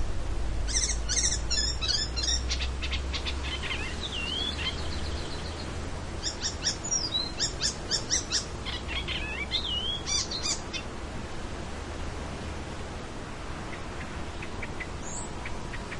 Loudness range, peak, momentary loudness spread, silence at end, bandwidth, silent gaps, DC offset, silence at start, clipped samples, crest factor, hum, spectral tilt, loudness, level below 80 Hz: 9 LU; -12 dBFS; 11 LU; 0 s; 11.5 kHz; none; under 0.1%; 0 s; under 0.1%; 18 dB; none; -2 dB/octave; -31 LUFS; -38 dBFS